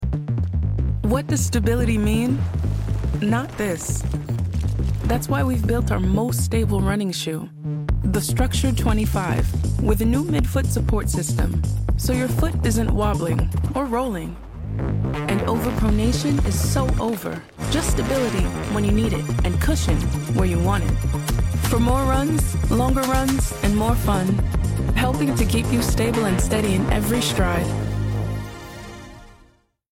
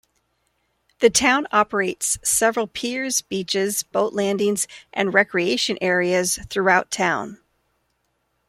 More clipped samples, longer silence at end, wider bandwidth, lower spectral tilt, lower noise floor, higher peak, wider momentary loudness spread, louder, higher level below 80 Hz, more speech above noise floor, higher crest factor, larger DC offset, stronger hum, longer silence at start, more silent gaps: neither; second, 0.65 s vs 1.15 s; about the same, 17 kHz vs 16.5 kHz; first, -6 dB/octave vs -2.5 dB/octave; second, -56 dBFS vs -71 dBFS; second, -6 dBFS vs -2 dBFS; about the same, 5 LU vs 7 LU; about the same, -22 LUFS vs -20 LUFS; first, -26 dBFS vs -56 dBFS; second, 36 dB vs 50 dB; second, 14 dB vs 20 dB; neither; neither; second, 0 s vs 1 s; neither